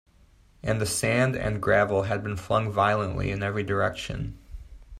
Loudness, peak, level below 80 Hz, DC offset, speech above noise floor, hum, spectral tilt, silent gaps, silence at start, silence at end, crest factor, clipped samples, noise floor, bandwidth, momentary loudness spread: -26 LUFS; -8 dBFS; -46 dBFS; under 0.1%; 32 dB; none; -5 dB/octave; none; 0.65 s; 0 s; 18 dB; under 0.1%; -57 dBFS; 15 kHz; 11 LU